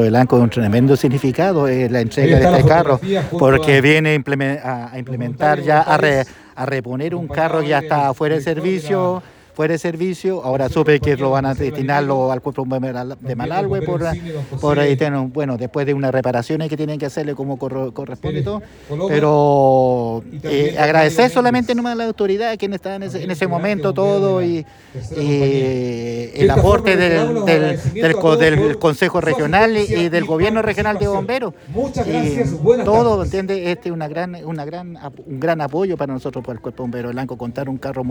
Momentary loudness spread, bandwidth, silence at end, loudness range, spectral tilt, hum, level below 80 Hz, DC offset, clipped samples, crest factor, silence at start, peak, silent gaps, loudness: 13 LU; over 20 kHz; 0 s; 7 LU; -7 dB/octave; none; -40 dBFS; under 0.1%; under 0.1%; 16 dB; 0 s; 0 dBFS; none; -17 LUFS